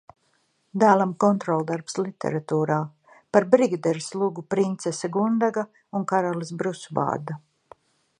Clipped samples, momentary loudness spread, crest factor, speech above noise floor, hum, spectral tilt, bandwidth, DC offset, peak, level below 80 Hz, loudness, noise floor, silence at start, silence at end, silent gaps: under 0.1%; 11 LU; 22 dB; 45 dB; none; -6.5 dB/octave; 11 kHz; under 0.1%; -2 dBFS; -70 dBFS; -24 LUFS; -68 dBFS; 0.75 s; 0.8 s; none